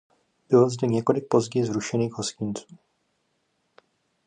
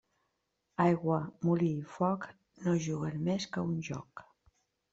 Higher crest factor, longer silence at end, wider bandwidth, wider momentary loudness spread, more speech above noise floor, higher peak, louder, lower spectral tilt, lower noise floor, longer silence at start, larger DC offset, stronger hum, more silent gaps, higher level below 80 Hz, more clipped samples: about the same, 20 dB vs 20 dB; first, 1.65 s vs 0.7 s; first, 10 kHz vs 7.8 kHz; second, 11 LU vs 14 LU; about the same, 49 dB vs 49 dB; first, -6 dBFS vs -14 dBFS; first, -24 LUFS vs -33 LUFS; about the same, -6 dB/octave vs -7 dB/octave; second, -73 dBFS vs -82 dBFS; second, 0.5 s vs 0.8 s; neither; neither; neither; about the same, -66 dBFS vs -70 dBFS; neither